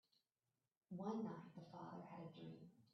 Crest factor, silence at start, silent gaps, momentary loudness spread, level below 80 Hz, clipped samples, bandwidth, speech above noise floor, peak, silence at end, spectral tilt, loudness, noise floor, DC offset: 18 dB; 0.9 s; none; 11 LU; under -90 dBFS; under 0.1%; 6.2 kHz; over 38 dB; -36 dBFS; 0.1 s; -7.5 dB/octave; -53 LUFS; under -90 dBFS; under 0.1%